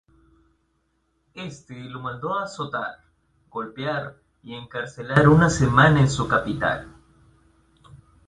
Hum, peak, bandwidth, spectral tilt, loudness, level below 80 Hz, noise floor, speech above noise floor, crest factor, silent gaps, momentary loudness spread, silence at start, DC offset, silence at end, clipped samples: none; -2 dBFS; 10.5 kHz; -6 dB/octave; -21 LUFS; -46 dBFS; -70 dBFS; 48 dB; 22 dB; none; 21 LU; 1.35 s; under 0.1%; 0.3 s; under 0.1%